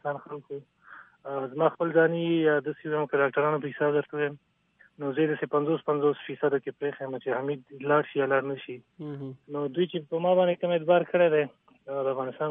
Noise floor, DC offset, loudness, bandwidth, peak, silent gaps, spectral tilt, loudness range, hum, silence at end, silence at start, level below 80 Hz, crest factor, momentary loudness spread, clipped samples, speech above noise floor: -63 dBFS; under 0.1%; -27 LUFS; 3.8 kHz; -10 dBFS; none; -10 dB/octave; 3 LU; none; 0 s; 0.05 s; -80 dBFS; 18 dB; 14 LU; under 0.1%; 36 dB